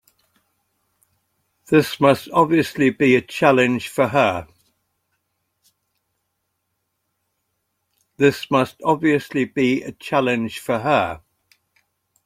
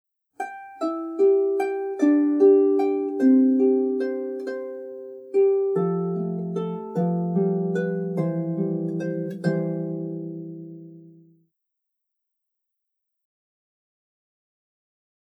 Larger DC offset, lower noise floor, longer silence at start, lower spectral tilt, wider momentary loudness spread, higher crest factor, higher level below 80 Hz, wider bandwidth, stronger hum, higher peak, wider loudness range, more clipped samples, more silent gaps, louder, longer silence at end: neither; second, -75 dBFS vs -81 dBFS; first, 1.7 s vs 0.4 s; second, -6 dB/octave vs -9.5 dB/octave; second, 8 LU vs 17 LU; about the same, 20 dB vs 18 dB; first, -60 dBFS vs -86 dBFS; first, 16 kHz vs 8 kHz; neither; first, -2 dBFS vs -8 dBFS; second, 8 LU vs 12 LU; neither; neither; first, -19 LUFS vs -23 LUFS; second, 1.1 s vs 4.2 s